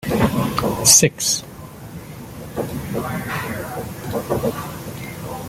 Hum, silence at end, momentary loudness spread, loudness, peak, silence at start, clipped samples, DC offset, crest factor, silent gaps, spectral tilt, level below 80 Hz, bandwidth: none; 0 s; 24 LU; -19 LUFS; 0 dBFS; 0 s; under 0.1%; under 0.1%; 22 dB; none; -3 dB/octave; -44 dBFS; 16.5 kHz